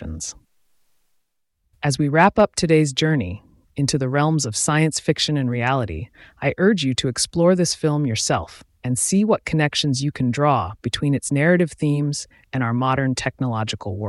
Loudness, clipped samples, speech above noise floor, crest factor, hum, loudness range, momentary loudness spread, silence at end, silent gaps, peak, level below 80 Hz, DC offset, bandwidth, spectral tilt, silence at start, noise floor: -20 LUFS; under 0.1%; 51 dB; 16 dB; none; 2 LU; 11 LU; 0 s; none; -4 dBFS; -48 dBFS; under 0.1%; 12 kHz; -5 dB/octave; 0 s; -71 dBFS